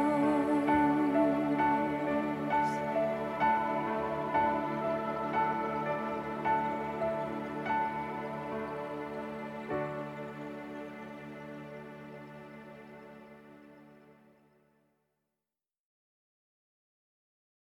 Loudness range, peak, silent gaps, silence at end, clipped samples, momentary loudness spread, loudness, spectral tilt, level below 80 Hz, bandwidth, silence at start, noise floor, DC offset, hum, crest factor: 19 LU; -16 dBFS; none; 3.65 s; under 0.1%; 19 LU; -32 LUFS; -7 dB/octave; -64 dBFS; 12.5 kHz; 0 s; under -90 dBFS; under 0.1%; none; 18 dB